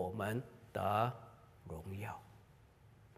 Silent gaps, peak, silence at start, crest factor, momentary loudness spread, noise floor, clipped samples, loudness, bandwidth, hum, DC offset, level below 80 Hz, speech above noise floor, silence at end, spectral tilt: none; -20 dBFS; 0 s; 22 dB; 22 LU; -64 dBFS; under 0.1%; -41 LUFS; 15.5 kHz; none; under 0.1%; -68 dBFS; 24 dB; 0.1 s; -6.5 dB/octave